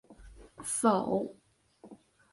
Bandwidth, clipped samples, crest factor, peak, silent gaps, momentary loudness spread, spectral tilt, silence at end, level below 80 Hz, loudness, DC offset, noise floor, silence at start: 12 kHz; under 0.1%; 22 dB; -12 dBFS; none; 15 LU; -5 dB/octave; 0.35 s; -62 dBFS; -31 LUFS; under 0.1%; -59 dBFS; 0.1 s